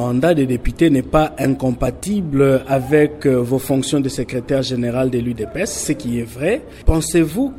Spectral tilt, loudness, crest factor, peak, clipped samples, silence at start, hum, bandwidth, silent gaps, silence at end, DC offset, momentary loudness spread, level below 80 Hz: -6 dB/octave; -18 LUFS; 16 dB; 0 dBFS; under 0.1%; 0 s; none; 16 kHz; none; 0 s; under 0.1%; 7 LU; -30 dBFS